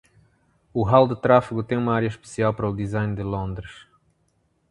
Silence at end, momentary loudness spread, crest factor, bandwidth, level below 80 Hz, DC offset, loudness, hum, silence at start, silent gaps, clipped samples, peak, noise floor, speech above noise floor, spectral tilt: 0.9 s; 13 LU; 22 dB; 11 kHz; -46 dBFS; under 0.1%; -22 LUFS; none; 0.75 s; none; under 0.1%; -2 dBFS; -67 dBFS; 46 dB; -7.5 dB/octave